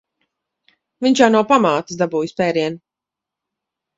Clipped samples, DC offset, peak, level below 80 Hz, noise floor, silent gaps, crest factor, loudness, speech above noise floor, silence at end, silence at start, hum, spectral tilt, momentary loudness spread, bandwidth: under 0.1%; under 0.1%; 0 dBFS; -62 dBFS; -86 dBFS; none; 20 dB; -17 LUFS; 70 dB; 1.2 s; 1 s; none; -5 dB/octave; 9 LU; 8 kHz